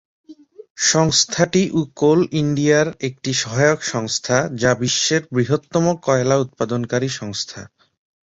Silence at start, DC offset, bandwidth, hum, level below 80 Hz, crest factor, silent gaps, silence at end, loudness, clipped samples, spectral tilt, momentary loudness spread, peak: 0.3 s; under 0.1%; 8 kHz; none; -52 dBFS; 18 dB; 0.70-0.75 s; 0.65 s; -18 LUFS; under 0.1%; -4 dB/octave; 8 LU; -2 dBFS